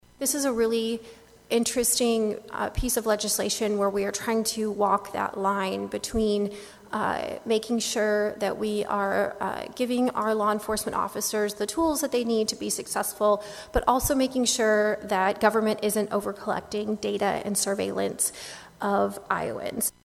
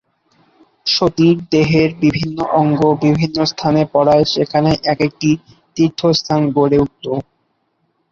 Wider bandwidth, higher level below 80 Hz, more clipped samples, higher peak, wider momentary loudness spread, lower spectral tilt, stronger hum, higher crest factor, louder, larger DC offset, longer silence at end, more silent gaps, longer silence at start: first, 15 kHz vs 7.2 kHz; about the same, -48 dBFS vs -46 dBFS; neither; second, -6 dBFS vs -2 dBFS; about the same, 7 LU vs 7 LU; second, -3 dB/octave vs -6.5 dB/octave; neither; first, 22 dB vs 14 dB; second, -26 LUFS vs -15 LUFS; neither; second, 0.15 s vs 0.9 s; neither; second, 0.2 s vs 0.85 s